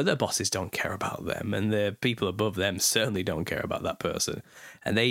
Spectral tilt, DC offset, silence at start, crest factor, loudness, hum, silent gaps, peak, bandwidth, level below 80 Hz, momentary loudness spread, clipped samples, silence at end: -3.5 dB/octave; under 0.1%; 0 s; 20 dB; -28 LUFS; none; none; -8 dBFS; 17 kHz; -56 dBFS; 8 LU; under 0.1%; 0 s